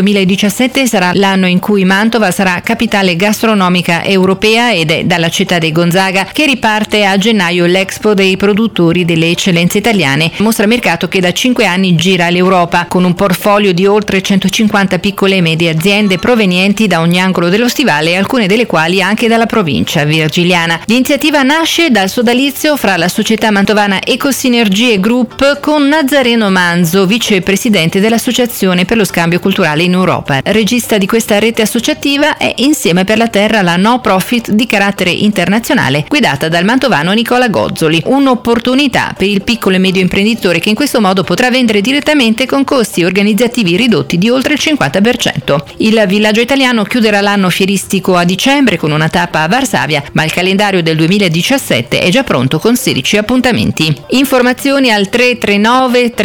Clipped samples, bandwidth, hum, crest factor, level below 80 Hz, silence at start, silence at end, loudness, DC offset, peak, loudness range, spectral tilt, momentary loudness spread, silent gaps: under 0.1%; over 20 kHz; none; 8 dB; -42 dBFS; 0 s; 0 s; -9 LUFS; under 0.1%; -2 dBFS; 1 LU; -4.5 dB/octave; 3 LU; none